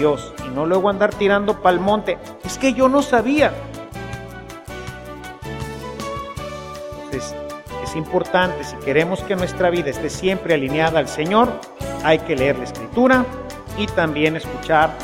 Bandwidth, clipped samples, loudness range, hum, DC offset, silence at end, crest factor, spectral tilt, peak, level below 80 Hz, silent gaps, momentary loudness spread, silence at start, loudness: 16.5 kHz; under 0.1%; 12 LU; none; under 0.1%; 0 s; 18 dB; -5.5 dB/octave; 0 dBFS; -42 dBFS; none; 16 LU; 0 s; -19 LUFS